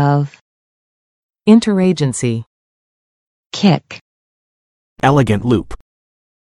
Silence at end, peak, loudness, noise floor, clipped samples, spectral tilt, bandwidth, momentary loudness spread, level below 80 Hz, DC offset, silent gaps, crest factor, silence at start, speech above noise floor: 0.7 s; 0 dBFS; -15 LUFS; under -90 dBFS; under 0.1%; -6.5 dB/octave; 11.5 kHz; 16 LU; -44 dBFS; under 0.1%; 0.41-1.29 s, 2.47-3.50 s, 4.01-4.96 s; 18 dB; 0 s; over 77 dB